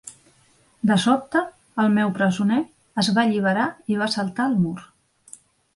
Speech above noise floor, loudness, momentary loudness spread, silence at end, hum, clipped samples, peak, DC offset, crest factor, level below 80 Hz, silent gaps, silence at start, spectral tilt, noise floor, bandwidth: 38 dB; -22 LUFS; 7 LU; 0.9 s; none; under 0.1%; -6 dBFS; under 0.1%; 16 dB; -64 dBFS; none; 0.05 s; -5.5 dB/octave; -59 dBFS; 11.5 kHz